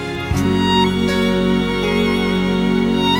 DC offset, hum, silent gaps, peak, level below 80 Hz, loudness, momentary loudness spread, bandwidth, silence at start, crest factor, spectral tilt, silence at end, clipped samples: under 0.1%; none; none; -2 dBFS; -34 dBFS; -17 LUFS; 3 LU; 16 kHz; 0 s; 14 dB; -6 dB/octave; 0 s; under 0.1%